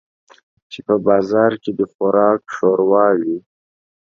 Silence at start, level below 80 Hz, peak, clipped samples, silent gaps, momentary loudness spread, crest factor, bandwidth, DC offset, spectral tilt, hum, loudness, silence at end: 0.7 s; -62 dBFS; 0 dBFS; under 0.1%; 1.94-1.99 s; 11 LU; 16 dB; 7.2 kHz; under 0.1%; -7.5 dB/octave; none; -16 LUFS; 0.65 s